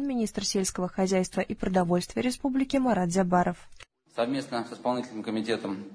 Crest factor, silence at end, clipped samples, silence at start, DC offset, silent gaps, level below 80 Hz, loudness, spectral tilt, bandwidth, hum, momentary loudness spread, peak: 18 dB; 0 s; under 0.1%; 0 s; under 0.1%; none; -52 dBFS; -28 LUFS; -5 dB/octave; 11 kHz; none; 7 LU; -10 dBFS